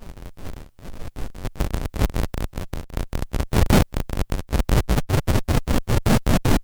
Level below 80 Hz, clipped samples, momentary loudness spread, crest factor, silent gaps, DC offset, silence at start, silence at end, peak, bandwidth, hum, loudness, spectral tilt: -26 dBFS; under 0.1%; 20 LU; 18 dB; none; under 0.1%; 0 s; 0 s; -4 dBFS; over 20 kHz; none; -24 LUFS; -6 dB/octave